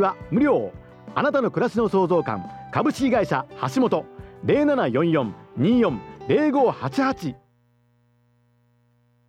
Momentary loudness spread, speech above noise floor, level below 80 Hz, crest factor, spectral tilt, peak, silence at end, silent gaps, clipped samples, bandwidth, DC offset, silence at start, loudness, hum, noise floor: 11 LU; 41 dB; -54 dBFS; 16 dB; -7 dB/octave; -6 dBFS; 1.95 s; none; under 0.1%; 13 kHz; under 0.1%; 0 s; -22 LUFS; 60 Hz at -50 dBFS; -63 dBFS